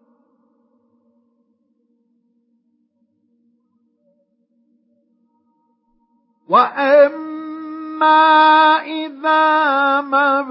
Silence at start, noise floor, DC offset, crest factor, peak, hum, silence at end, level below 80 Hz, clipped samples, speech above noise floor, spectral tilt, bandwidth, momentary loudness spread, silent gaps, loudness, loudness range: 6.5 s; -64 dBFS; under 0.1%; 18 dB; 0 dBFS; none; 0 s; -86 dBFS; under 0.1%; 51 dB; -8 dB/octave; 5.8 kHz; 19 LU; none; -13 LUFS; 7 LU